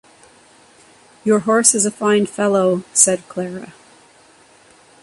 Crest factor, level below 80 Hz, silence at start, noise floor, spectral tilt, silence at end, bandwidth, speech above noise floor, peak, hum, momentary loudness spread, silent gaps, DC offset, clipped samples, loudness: 20 dB; -64 dBFS; 1.25 s; -49 dBFS; -3.5 dB/octave; 1.3 s; 14 kHz; 33 dB; 0 dBFS; none; 14 LU; none; under 0.1%; under 0.1%; -16 LUFS